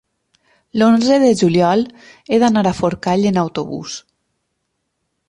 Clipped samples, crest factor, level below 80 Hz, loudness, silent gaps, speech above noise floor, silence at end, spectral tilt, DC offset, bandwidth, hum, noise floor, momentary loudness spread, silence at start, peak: under 0.1%; 14 dB; -52 dBFS; -15 LUFS; none; 57 dB; 1.3 s; -6 dB/octave; under 0.1%; 11 kHz; none; -72 dBFS; 14 LU; 0.75 s; -2 dBFS